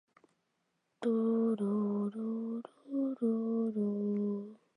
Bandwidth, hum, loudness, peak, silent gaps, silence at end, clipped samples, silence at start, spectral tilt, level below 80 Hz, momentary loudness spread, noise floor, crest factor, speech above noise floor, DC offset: 9.6 kHz; none; -34 LUFS; -22 dBFS; none; 0.2 s; under 0.1%; 1 s; -10 dB/octave; -88 dBFS; 8 LU; -81 dBFS; 12 dB; 49 dB; under 0.1%